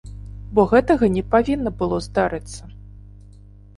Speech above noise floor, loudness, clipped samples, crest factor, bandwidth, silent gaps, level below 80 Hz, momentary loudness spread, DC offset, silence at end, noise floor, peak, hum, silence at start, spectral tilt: 26 dB; -19 LUFS; under 0.1%; 18 dB; 11.5 kHz; none; -38 dBFS; 21 LU; under 0.1%; 0.8 s; -44 dBFS; -2 dBFS; 50 Hz at -35 dBFS; 0.05 s; -7 dB/octave